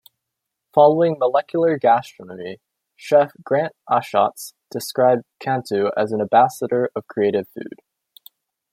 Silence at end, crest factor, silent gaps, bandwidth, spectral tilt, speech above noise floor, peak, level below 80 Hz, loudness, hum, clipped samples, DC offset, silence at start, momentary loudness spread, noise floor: 1.05 s; 18 dB; none; 16 kHz; -6 dB/octave; 62 dB; -2 dBFS; -70 dBFS; -19 LUFS; none; under 0.1%; under 0.1%; 0.75 s; 18 LU; -81 dBFS